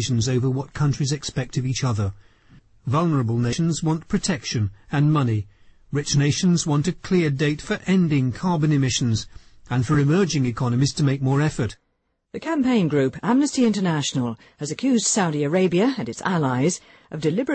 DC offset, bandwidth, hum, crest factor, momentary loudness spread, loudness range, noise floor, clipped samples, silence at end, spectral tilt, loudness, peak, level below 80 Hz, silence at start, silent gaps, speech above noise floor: under 0.1%; 8.8 kHz; none; 14 dB; 8 LU; 3 LU; -71 dBFS; under 0.1%; 0 s; -5.5 dB/octave; -22 LUFS; -8 dBFS; -48 dBFS; 0 s; none; 50 dB